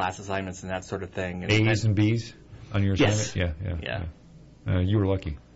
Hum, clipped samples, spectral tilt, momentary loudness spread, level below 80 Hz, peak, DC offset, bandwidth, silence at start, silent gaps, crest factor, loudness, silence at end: none; under 0.1%; -5.5 dB/octave; 11 LU; -44 dBFS; -12 dBFS; under 0.1%; 8 kHz; 0 s; none; 14 dB; -27 LUFS; 0.2 s